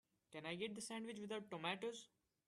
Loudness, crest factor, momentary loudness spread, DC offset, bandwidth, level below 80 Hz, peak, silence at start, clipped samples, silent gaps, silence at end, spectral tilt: -48 LUFS; 22 dB; 12 LU; under 0.1%; 13 kHz; -88 dBFS; -28 dBFS; 0.3 s; under 0.1%; none; 0.4 s; -3.5 dB/octave